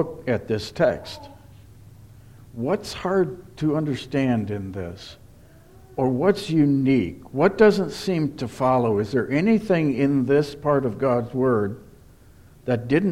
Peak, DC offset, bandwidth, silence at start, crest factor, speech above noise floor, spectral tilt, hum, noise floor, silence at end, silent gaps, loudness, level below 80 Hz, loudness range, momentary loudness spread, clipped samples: -4 dBFS; under 0.1%; 14.5 kHz; 0 s; 18 dB; 28 dB; -7.5 dB/octave; none; -49 dBFS; 0 s; none; -22 LUFS; -52 dBFS; 6 LU; 14 LU; under 0.1%